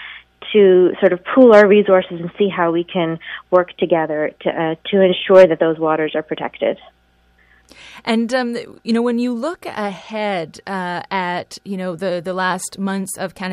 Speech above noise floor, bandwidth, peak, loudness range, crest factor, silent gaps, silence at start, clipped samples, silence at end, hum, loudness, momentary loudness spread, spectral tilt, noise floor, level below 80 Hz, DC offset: 40 dB; 13.5 kHz; 0 dBFS; 9 LU; 16 dB; none; 0 s; under 0.1%; 0 s; none; -17 LUFS; 15 LU; -5.5 dB/octave; -56 dBFS; -60 dBFS; under 0.1%